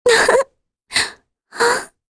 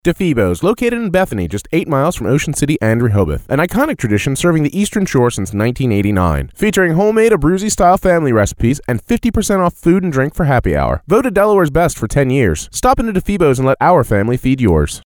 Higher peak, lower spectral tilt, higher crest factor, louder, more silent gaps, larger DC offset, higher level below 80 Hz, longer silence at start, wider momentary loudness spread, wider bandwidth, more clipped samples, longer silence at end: about the same, -2 dBFS vs 0 dBFS; second, -0.5 dB/octave vs -6 dB/octave; about the same, 16 dB vs 14 dB; second, -17 LUFS vs -14 LUFS; neither; neither; second, -52 dBFS vs -28 dBFS; about the same, 0.05 s vs 0.05 s; first, 13 LU vs 5 LU; second, 11 kHz vs over 20 kHz; neither; first, 0.25 s vs 0.05 s